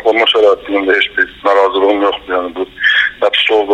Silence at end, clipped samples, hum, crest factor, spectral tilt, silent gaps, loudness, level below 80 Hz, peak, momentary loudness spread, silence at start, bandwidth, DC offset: 0 s; under 0.1%; none; 12 dB; -3 dB/octave; none; -12 LUFS; -48 dBFS; 0 dBFS; 7 LU; 0 s; 9.6 kHz; under 0.1%